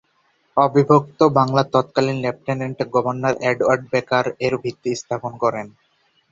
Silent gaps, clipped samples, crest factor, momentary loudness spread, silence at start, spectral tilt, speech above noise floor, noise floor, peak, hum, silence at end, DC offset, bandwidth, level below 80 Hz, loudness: none; under 0.1%; 18 dB; 10 LU; 0.55 s; -6.5 dB/octave; 44 dB; -63 dBFS; -2 dBFS; none; 0.65 s; under 0.1%; 7.8 kHz; -58 dBFS; -19 LUFS